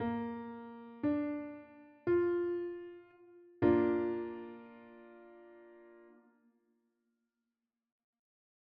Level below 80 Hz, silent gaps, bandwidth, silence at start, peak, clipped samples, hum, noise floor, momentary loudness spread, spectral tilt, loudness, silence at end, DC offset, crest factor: -72 dBFS; none; 4.6 kHz; 0 s; -16 dBFS; under 0.1%; none; under -90 dBFS; 26 LU; -7.5 dB/octave; -35 LUFS; 2.75 s; under 0.1%; 22 dB